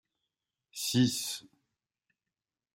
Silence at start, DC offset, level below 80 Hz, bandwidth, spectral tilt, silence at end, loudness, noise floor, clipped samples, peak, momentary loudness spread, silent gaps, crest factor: 0.75 s; under 0.1%; -74 dBFS; 16 kHz; -4 dB/octave; 1.3 s; -31 LUFS; under -90 dBFS; under 0.1%; -14 dBFS; 15 LU; none; 22 dB